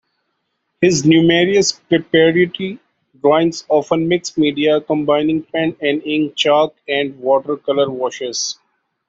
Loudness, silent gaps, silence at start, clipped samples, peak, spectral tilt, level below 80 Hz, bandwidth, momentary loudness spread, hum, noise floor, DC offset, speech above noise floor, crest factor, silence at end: -16 LUFS; none; 0.8 s; under 0.1%; -2 dBFS; -4.5 dB/octave; -56 dBFS; 8 kHz; 9 LU; none; -71 dBFS; under 0.1%; 55 dB; 16 dB; 0.55 s